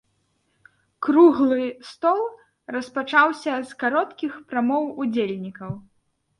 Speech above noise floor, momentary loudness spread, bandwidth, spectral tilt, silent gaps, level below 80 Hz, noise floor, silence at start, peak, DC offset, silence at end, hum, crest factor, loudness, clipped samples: 48 dB; 16 LU; 11 kHz; -6 dB/octave; none; -66 dBFS; -69 dBFS; 1 s; -4 dBFS; under 0.1%; 0.6 s; none; 18 dB; -22 LUFS; under 0.1%